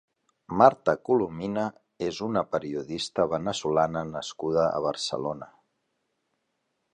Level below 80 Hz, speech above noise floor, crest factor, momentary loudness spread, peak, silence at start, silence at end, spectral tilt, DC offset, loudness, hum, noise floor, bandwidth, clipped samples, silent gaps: -60 dBFS; 51 dB; 26 dB; 13 LU; -2 dBFS; 0.5 s; 1.45 s; -5 dB/octave; under 0.1%; -27 LUFS; none; -77 dBFS; 11 kHz; under 0.1%; none